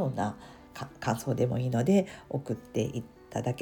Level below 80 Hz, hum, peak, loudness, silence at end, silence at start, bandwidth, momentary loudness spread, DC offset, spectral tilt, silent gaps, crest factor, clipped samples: -58 dBFS; none; -14 dBFS; -31 LUFS; 0 s; 0 s; 19 kHz; 17 LU; under 0.1%; -7 dB/octave; none; 18 dB; under 0.1%